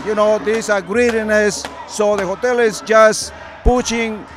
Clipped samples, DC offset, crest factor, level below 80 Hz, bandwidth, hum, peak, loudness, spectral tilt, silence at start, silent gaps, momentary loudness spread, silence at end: under 0.1%; under 0.1%; 16 dB; -30 dBFS; 15 kHz; none; 0 dBFS; -16 LUFS; -3.5 dB/octave; 0 s; none; 10 LU; 0 s